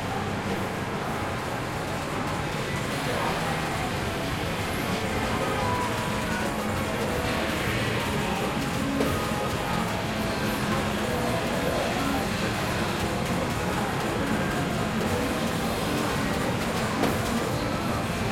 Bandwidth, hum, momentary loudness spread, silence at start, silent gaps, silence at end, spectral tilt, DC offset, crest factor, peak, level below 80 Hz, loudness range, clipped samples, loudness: 16.5 kHz; none; 3 LU; 0 s; none; 0 s; -5 dB/octave; under 0.1%; 18 dB; -10 dBFS; -42 dBFS; 2 LU; under 0.1%; -27 LUFS